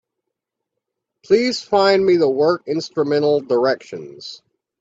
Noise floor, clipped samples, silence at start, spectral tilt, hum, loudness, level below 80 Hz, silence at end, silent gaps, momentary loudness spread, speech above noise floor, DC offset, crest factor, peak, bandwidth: -80 dBFS; under 0.1%; 1.3 s; -5.5 dB/octave; none; -17 LUFS; -64 dBFS; 0.45 s; none; 19 LU; 63 dB; under 0.1%; 16 dB; -2 dBFS; 7.8 kHz